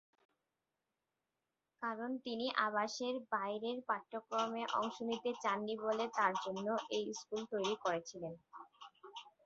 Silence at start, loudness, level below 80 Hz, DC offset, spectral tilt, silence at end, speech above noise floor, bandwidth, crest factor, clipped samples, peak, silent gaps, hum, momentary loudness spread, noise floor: 1.8 s; -39 LUFS; -86 dBFS; under 0.1%; -2 dB/octave; 0.15 s; 51 dB; 7.6 kHz; 24 dB; under 0.1%; -18 dBFS; none; none; 15 LU; -90 dBFS